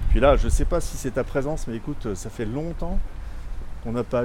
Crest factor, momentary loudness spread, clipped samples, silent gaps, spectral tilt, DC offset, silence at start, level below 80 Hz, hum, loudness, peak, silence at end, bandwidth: 18 dB; 19 LU; under 0.1%; none; -6 dB/octave; under 0.1%; 0 s; -26 dBFS; none; -26 LUFS; -6 dBFS; 0 s; 14 kHz